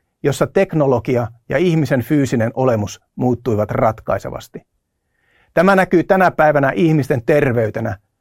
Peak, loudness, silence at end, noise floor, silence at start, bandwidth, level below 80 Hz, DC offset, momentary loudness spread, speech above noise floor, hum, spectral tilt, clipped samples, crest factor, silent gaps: 0 dBFS; -16 LUFS; 0.25 s; -69 dBFS; 0.25 s; 16.5 kHz; -46 dBFS; under 0.1%; 9 LU; 53 dB; none; -7 dB/octave; under 0.1%; 16 dB; none